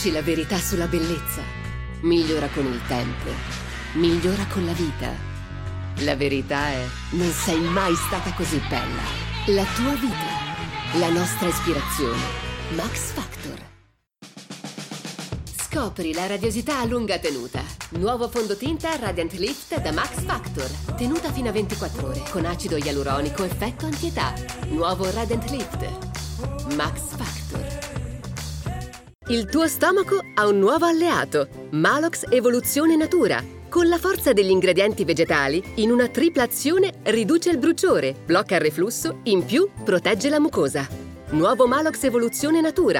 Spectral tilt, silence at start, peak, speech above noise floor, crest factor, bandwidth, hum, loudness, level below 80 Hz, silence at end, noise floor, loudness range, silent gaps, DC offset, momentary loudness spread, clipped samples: -4.5 dB/octave; 0 s; -4 dBFS; 35 dB; 18 dB; 18 kHz; none; -23 LUFS; -38 dBFS; 0 s; -57 dBFS; 8 LU; none; under 0.1%; 12 LU; under 0.1%